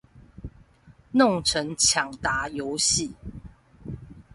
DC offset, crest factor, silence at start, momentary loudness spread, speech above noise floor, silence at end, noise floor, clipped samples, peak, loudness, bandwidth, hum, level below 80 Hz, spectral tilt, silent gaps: under 0.1%; 20 dB; 0.15 s; 24 LU; 31 dB; 0.15 s; -55 dBFS; under 0.1%; -8 dBFS; -23 LUFS; 12 kHz; none; -48 dBFS; -2.5 dB/octave; none